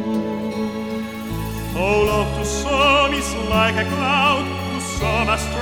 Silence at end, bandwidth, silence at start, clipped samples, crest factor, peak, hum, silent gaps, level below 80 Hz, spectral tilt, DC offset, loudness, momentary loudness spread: 0 s; over 20 kHz; 0 s; under 0.1%; 16 dB; -4 dBFS; none; none; -32 dBFS; -4.5 dB/octave; 0.2%; -19 LUFS; 11 LU